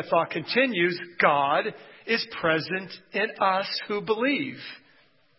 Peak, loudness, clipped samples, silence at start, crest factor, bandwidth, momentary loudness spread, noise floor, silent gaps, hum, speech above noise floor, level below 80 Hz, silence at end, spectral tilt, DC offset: -6 dBFS; -25 LUFS; under 0.1%; 0 s; 22 dB; 5.8 kHz; 11 LU; -62 dBFS; none; none; 36 dB; -70 dBFS; 0.6 s; -8.5 dB/octave; under 0.1%